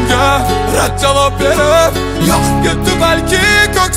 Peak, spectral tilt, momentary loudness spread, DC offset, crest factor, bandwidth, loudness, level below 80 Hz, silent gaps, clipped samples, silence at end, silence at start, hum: 0 dBFS; -4 dB/octave; 4 LU; under 0.1%; 10 dB; 16.5 kHz; -11 LUFS; -22 dBFS; none; under 0.1%; 0 s; 0 s; none